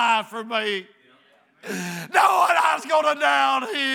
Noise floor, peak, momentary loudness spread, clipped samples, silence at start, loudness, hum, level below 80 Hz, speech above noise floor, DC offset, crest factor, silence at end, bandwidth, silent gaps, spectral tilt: -58 dBFS; -4 dBFS; 13 LU; under 0.1%; 0 s; -21 LUFS; none; under -90 dBFS; 36 dB; under 0.1%; 18 dB; 0 s; over 20 kHz; none; -2.5 dB/octave